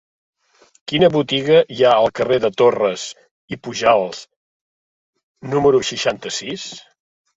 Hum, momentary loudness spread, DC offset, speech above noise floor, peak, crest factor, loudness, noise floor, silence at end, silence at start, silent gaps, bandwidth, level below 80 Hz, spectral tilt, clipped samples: none; 18 LU; under 0.1%; over 73 dB; -2 dBFS; 18 dB; -17 LUFS; under -90 dBFS; 0.6 s; 0.9 s; 3.31-3.48 s, 4.36-5.13 s, 5.23-5.35 s; 8 kHz; -56 dBFS; -4.5 dB/octave; under 0.1%